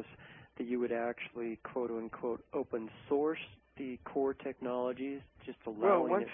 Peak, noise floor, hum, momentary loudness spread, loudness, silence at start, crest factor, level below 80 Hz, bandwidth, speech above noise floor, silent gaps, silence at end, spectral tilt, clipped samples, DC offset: -16 dBFS; -56 dBFS; none; 16 LU; -37 LUFS; 0 s; 22 dB; -70 dBFS; 3.7 kHz; 20 dB; none; 0 s; -2 dB/octave; under 0.1%; under 0.1%